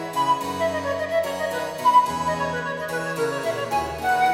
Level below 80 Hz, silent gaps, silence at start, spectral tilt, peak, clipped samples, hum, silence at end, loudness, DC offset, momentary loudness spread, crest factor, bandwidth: -52 dBFS; none; 0 s; -4 dB/octave; -6 dBFS; under 0.1%; none; 0 s; -23 LUFS; under 0.1%; 9 LU; 16 dB; 16.5 kHz